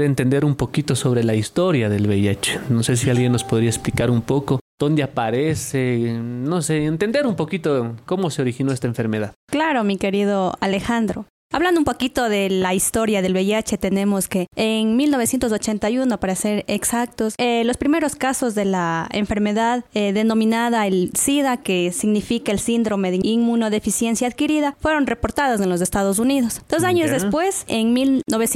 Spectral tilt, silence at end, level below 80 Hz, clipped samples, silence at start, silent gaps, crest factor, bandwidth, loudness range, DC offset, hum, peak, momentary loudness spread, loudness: -5 dB/octave; 0 s; -46 dBFS; under 0.1%; 0 s; 4.61-4.78 s, 9.36-9.48 s, 11.30-11.50 s; 14 dB; 16 kHz; 2 LU; under 0.1%; none; -4 dBFS; 4 LU; -20 LUFS